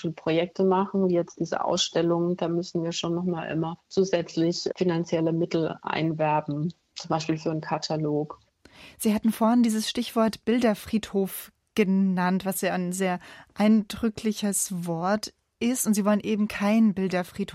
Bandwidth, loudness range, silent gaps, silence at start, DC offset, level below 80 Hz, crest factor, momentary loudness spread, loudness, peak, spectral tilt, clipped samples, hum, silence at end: 16 kHz; 2 LU; none; 0 s; under 0.1%; -60 dBFS; 16 dB; 7 LU; -26 LUFS; -10 dBFS; -5 dB/octave; under 0.1%; none; 0 s